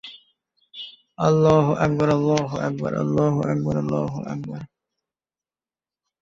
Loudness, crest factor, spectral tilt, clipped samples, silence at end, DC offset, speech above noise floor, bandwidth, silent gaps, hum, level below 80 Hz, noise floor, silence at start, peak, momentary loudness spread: -21 LUFS; 20 dB; -7.5 dB/octave; under 0.1%; 1.55 s; under 0.1%; over 69 dB; 7.6 kHz; none; none; -52 dBFS; under -90 dBFS; 0.05 s; -2 dBFS; 20 LU